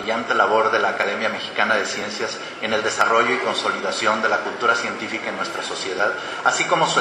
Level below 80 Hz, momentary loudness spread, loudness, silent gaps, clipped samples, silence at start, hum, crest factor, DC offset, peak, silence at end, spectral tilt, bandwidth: -68 dBFS; 8 LU; -20 LUFS; none; under 0.1%; 0 s; none; 18 dB; under 0.1%; -2 dBFS; 0 s; -2.5 dB/octave; 13.5 kHz